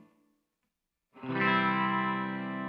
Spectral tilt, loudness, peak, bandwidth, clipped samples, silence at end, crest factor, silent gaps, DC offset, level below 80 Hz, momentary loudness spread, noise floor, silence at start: -8 dB/octave; -29 LUFS; -16 dBFS; 5.6 kHz; under 0.1%; 0 s; 18 dB; none; under 0.1%; -74 dBFS; 10 LU; -84 dBFS; 1.15 s